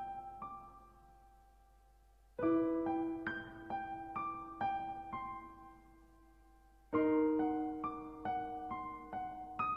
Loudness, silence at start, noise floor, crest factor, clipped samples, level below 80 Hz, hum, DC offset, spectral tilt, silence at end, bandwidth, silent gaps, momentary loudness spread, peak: -39 LUFS; 0 s; -66 dBFS; 18 dB; under 0.1%; -64 dBFS; none; under 0.1%; -8 dB/octave; 0 s; 5.2 kHz; none; 16 LU; -22 dBFS